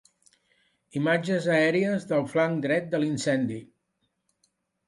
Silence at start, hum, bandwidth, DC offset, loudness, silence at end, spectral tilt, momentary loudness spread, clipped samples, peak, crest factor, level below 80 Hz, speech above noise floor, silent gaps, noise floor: 0.95 s; none; 11.5 kHz; under 0.1%; -26 LUFS; 1.25 s; -6 dB/octave; 7 LU; under 0.1%; -10 dBFS; 18 dB; -70 dBFS; 51 dB; none; -77 dBFS